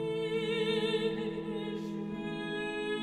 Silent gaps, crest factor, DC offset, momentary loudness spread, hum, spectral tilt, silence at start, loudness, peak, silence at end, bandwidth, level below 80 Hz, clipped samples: none; 14 dB; under 0.1%; 7 LU; none; -5.5 dB/octave; 0 s; -34 LUFS; -20 dBFS; 0 s; 11 kHz; -64 dBFS; under 0.1%